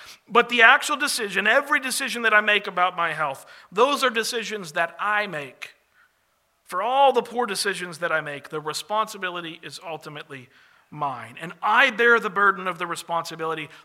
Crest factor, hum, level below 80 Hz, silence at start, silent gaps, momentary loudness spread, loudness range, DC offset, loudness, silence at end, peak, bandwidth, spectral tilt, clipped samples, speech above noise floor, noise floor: 24 dB; none; -80 dBFS; 0 s; none; 18 LU; 9 LU; under 0.1%; -22 LUFS; 0.1 s; 0 dBFS; 16 kHz; -2 dB/octave; under 0.1%; 45 dB; -68 dBFS